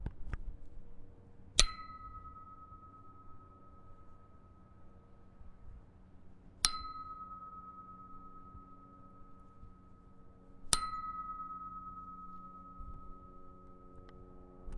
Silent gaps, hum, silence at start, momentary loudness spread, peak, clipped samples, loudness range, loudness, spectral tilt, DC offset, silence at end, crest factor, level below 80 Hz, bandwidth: none; none; 0 s; 28 LU; -4 dBFS; under 0.1%; 19 LU; -39 LUFS; -1 dB/octave; under 0.1%; 0 s; 38 dB; -50 dBFS; 10.5 kHz